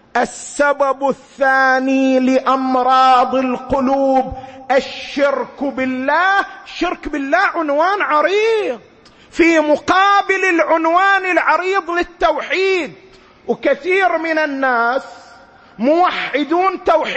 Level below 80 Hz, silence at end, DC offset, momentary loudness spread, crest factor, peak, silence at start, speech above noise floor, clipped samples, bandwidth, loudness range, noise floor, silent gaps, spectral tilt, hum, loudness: -46 dBFS; 0 s; under 0.1%; 9 LU; 14 dB; 0 dBFS; 0.15 s; 28 dB; under 0.1%; 8.8 kHz; 4 LU; -43 dBFS; none; -3.5 dB/octave; none; -15 LUFS